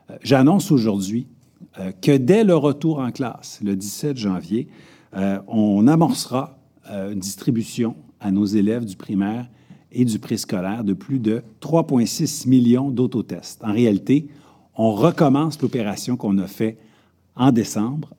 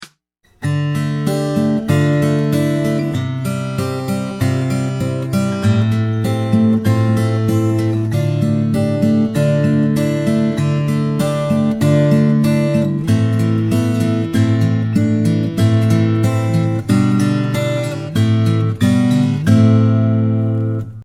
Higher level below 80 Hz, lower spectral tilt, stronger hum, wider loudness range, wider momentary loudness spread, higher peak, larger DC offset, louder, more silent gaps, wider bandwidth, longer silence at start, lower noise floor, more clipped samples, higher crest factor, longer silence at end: second, -64 dBFS vs -46 dBFS; about the same, -6.5 dB/octave vs -7.5 dB/octave; neither; about the same, 4 LU vs 3 LU; first, 13 LU vs 6 LU; about the same, -2 dBFS vs 0 dBFS; neither; second, -20 LUFS vs -16 LUFS; neither; first, 17.5 kHz vs 14.5 kHz; about the same, 0.1 s vs 0 s; about the same, -56 dBFS vs -57 dBFS; neither; about the same, 18 dB vs 14 dB; first, 0.15 s vs 0 s